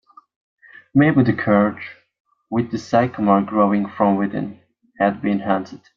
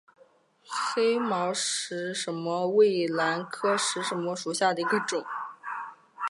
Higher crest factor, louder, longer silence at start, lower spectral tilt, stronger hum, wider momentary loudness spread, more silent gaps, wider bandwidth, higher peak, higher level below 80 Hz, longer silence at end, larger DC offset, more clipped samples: about the same, 18 dB vs 18 dB; first, -19 LUFS vs -28 LUFS; first, 0.95 s vs 0.7 s; first, -8.5 dB/octave vs -3 dB/octave; neither; second, 9 LU vs 13 LU; first, 2.20-2.25 s vs none; second, 7.2 kHz vs 11.5 kHz; first, -2 dBFS vs -12 dBFS; first, -58 dBFS vs -84 dBFS; first, 0.2 s vs 0 s; neither; neither